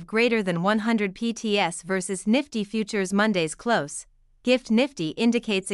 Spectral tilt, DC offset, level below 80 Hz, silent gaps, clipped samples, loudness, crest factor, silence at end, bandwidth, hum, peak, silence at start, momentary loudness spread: -4.5 dB/octave; under 0.1%; -60 dBFS; none; under 0.1%; -24 LUFS; 18 dB; 0 s; 12 kHz; none; -6 dBFS; 0 s; 6 LU